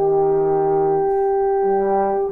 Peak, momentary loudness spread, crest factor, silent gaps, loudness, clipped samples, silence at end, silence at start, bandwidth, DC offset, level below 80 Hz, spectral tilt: -10 dBFS; 1 LU; 8 dB; none; -18 LUFS; under 0.1%; 0 s; 0 s; 2.5 kHz; under 0.1%; -46 dBFS; -11 dB/octave